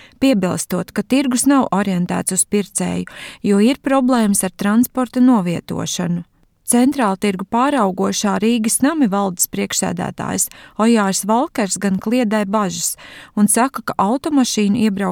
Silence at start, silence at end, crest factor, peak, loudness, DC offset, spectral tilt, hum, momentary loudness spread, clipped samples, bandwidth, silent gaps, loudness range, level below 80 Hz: 0.2 s; 0 s; 14 dB; -4 dBFS; -17 LUFS; under 0.1%; -4.5 dB/octave; none; 8 LU; under 0.1%; 18.5 kHz; none; 1 LU; -52 dBFS